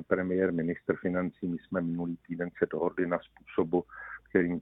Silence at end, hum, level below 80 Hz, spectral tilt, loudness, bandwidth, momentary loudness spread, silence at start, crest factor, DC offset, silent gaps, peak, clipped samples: 0 s; none; -64 dBFS; -11 dB/octave; -32 LUFS; 3.9 kHz; 8 LU; 0 s; 22 dB; under 0.1%; none; -10 dBFS; under 0.1%